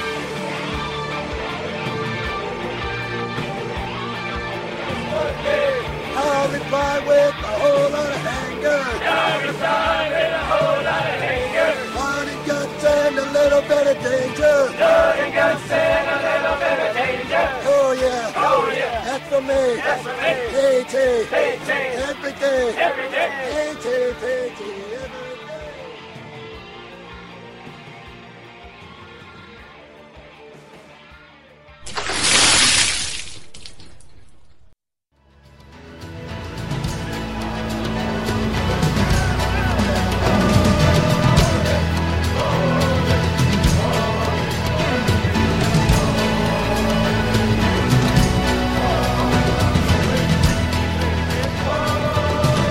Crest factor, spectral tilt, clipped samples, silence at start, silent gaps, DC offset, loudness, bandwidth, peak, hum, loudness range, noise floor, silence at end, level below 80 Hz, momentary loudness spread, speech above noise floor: 18 dB; -4.5 dB/octave; under 0.1%; 0 s; none; under 0.1%; -19 LUFS; 16 kHz; -2 dBFS; none; 14 LU; -65 dBFS; 0 s; -32 dBFS; 17 LU; 46 dB